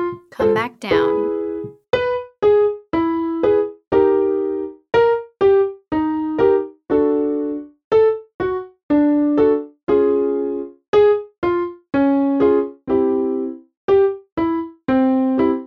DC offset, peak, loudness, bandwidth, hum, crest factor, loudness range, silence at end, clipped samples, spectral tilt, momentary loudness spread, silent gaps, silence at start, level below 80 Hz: under 0.1%; -4 dBFS; -18 LUFS; 6 kHz; none; 14 dB; 1 LU; 0 s; under 0.1%; -8 dB/octave; 9 LU; 7.84-7.91 s, 8.34-8.39 s, 8.83-8.89 s, 9.83-9.87 s, 10.88-10.93 s, 11.38-11.42 s, 13.77-13.88 s, 14.32-14.37 s; 0 s; -50 dBFS